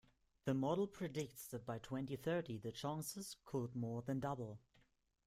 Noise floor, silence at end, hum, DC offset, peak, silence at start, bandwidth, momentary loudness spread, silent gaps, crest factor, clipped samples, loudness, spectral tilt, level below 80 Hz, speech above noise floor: -77 dBFS; 0.7 s; none; under 0.1%; -26 dBFS; 0.45 s; 16 kHz; 8 LU; none; 20 dB; under 0.1%; -44 LUFS; -6 dB/octave; -74 dBFS; 33 dB